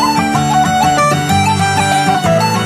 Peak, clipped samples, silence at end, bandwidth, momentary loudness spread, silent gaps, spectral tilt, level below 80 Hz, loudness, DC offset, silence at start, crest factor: 0 dBFS; under 0.1%; 0 s; 15 kHz; 1 LU; none; -4.5 dB/octave; -34 dBFS; -12 LUFS; under 0.1%; 0 s; 12 dB